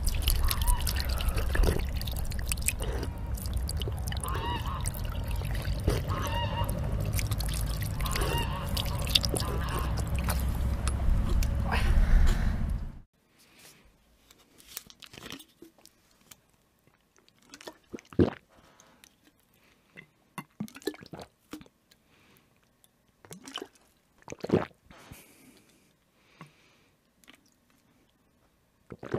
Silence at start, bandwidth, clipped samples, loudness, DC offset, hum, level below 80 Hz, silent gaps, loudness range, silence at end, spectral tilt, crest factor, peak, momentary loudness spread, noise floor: 0 s; 16 kHz; under 0.1%; -31 LUFS; under 0.1%; none; -34 dBFS; 13.06-13.13 s; 18 LU; 0 s; -4.5 dB/octave; 28 dB; -2 dBFS; 21 LU; -68 dBFS